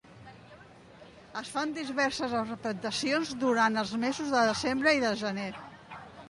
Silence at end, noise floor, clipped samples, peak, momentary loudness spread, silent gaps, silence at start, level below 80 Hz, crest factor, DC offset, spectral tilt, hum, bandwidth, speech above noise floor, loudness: 0 s; -53 dBFS; under 0.1%; -12 dBFS; 17 LU; none; 0.05 s; -64 dBFS; 18 dB; under 0.1%; -3.5 dB/octave; none; 11.5 kHz; 23 dB; -29 LUFS